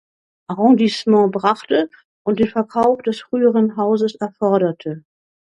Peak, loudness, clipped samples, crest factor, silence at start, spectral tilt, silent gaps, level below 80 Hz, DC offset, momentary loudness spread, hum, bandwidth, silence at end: 0 dBFS; -17 LUFS; under 0.1%; 16 dB; 0.5 s; -7 dB/octave; 2.05-2.25 s; -60 dBFS; under 0.1%; 12 LU; none; 10 kHz; 0.6 s